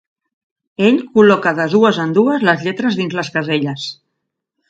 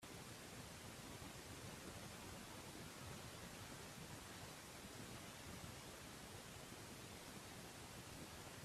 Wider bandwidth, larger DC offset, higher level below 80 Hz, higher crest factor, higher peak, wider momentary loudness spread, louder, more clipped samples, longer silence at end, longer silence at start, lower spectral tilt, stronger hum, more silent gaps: second, 8 kHz vs 15.5 kHz; neither; first, -62 dBFS vs -70 dBFS; about the same, 16 dB vs 16 dB; first, 0 dBFS vs -40 dBFS; first, 10 LU vs 1 LU; first, -15 LUFS vs -55 LUFS; neither; first, 0.75 s vs 0 s; first, 0.8 s vs 0 s; first, -6 dB/octave vs -3.5 dB/octave; neither; neither